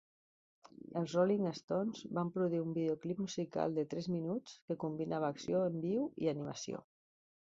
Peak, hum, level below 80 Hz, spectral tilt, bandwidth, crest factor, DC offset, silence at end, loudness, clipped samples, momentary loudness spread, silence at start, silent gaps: -20 dBFS; none; -76 dBFS; -7 dB/octave; 7.6 kHz; 18 dB; under 0.1%; 0.8 s; -38 LUFS; under 0.1%; 9 LU; 0.65 s; 1.63-1.68 s, 4.62-4.68 s